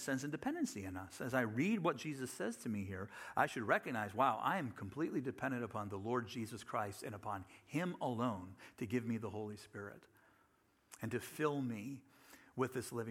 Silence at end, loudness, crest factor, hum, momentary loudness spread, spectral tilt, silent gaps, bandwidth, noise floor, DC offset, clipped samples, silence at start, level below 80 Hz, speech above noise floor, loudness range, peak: 0 s; -41 LUFS; 22 dB; none; 12 LU; -5.5 dB/octave; none; 16 kHz; -74 dBFS; under 0.1%; under 0.1%; 0 s; -78 dBFS; 34 dB; 6 LU; -18 dBFS